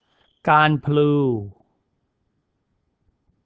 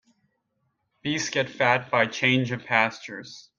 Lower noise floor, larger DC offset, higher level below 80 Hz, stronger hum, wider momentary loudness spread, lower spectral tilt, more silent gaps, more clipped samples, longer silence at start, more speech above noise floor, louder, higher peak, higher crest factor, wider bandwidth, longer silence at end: about the same, -72 dBFS vs -75 dBFS; neither; first, -58 dBFS vs -68 dBFS; neither; about the same, 13 LU vs 15 LU; first, -9 dB/octave vs -4 dB/octave; neither; neither; second, 0.45 s vs 1.05 s; first, 54 dB vs 50 dB; first, -19 LUFS vs -24 LUFS; about the same, -2 dBFS vs -4 dBFS; about the same, 22 dB vs 22 dB; second, 5 kHz vs 7.6 kHz; first, 1.95 s vs 0.2 s